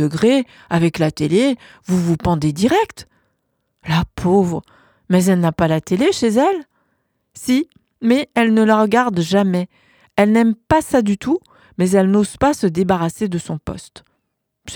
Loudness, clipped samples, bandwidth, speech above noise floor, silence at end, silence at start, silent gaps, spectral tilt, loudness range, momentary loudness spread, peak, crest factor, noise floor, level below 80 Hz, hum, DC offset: -17 LUFS; under 0.1%; 19 kHz; 57 dB; 0 s; 0 s; none; -6 dB/octave; 3 LU; 11 LU; 0 dBFS; 16 dB; -73 dBFS; -44 dBFS; none; under 0.1%